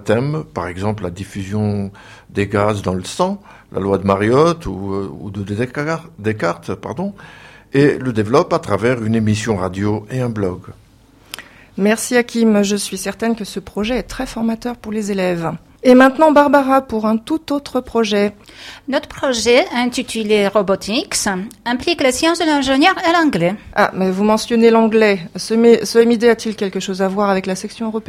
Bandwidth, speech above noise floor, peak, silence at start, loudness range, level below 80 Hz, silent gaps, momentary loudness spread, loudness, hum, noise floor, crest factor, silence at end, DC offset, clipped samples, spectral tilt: 15.5 kHz; 31 dB; 0 dBFS; 0 s; 6 LU; -46 dBFS; none; 13 LU; -16 LUFS; none; -47 dBFS; 16 dB; 0.05 s; under 0.1%; under 0.1%; -5 dB/octave